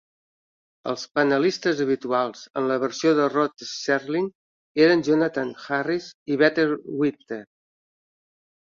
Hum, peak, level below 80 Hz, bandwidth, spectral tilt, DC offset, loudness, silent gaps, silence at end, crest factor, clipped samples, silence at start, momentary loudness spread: none; -6 dBFS; -68 dBFS; 7.6 kHz; -5 dB/octave; under 0.1%; -23 LUFS; 4.35-4.75 s, 6.14-6.26 s; 1.2 s; 18 dB; under 0.1%; 0.85 s; 11 LU